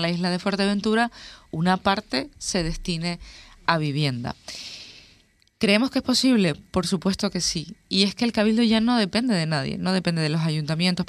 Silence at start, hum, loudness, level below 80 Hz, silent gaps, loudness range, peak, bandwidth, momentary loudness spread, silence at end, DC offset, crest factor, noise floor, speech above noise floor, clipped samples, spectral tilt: 0 s; none; -23 LUFS; -46 dBFS; none; 5 LU; -2 dBFS; 14 kHz; 12 LU; 0.05 s; under 0.1%; 22 dB; -59 dBFS; 36 dB; under 0.1%; -5 dB/octave